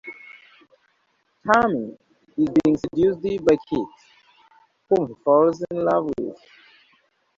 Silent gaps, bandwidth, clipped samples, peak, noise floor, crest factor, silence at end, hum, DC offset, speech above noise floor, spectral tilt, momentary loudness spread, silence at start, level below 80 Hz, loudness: none; 7.6 kHz; under 0.1%; -4 dBFS; -68 dBFS; 20 dB; 1 s; none; under 0.1%; 47 dB; -7 dB/octave; 16 LU; 0.05 s; -56 dBFS; -21 LUFS